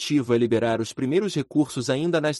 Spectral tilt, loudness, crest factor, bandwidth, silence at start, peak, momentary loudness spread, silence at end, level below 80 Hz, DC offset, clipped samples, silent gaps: -5.5 dB/octave; -23 LUFS; 14 dB; 12 kHz; 0 s; -10 dBFS; 4 LU; 0 s; -62 dBFS; under 0.1%; under 0.1%; none